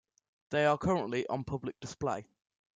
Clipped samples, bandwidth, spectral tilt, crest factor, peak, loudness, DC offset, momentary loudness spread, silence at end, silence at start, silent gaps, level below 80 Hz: under 0.1%; 9.4 kHz; -6 dB/octave; 18 dB; -16 dBFS; -33 LUFS; under 0.1%; 11 LU; 0.55 s; 0.5 s; none; -60 dBFS